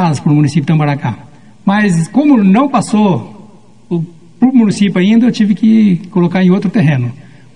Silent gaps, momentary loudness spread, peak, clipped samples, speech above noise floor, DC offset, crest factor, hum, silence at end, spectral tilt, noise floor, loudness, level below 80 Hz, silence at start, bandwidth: none; 11 LU; 0 dBFS; under 0.1%; 30 dB; 0.9%; 12 dB; none; 0.4 s; -7.5 dB/octave; -40 dBFS; -11 LUFS; -52 dBFS; 0 s; 10.5 kHz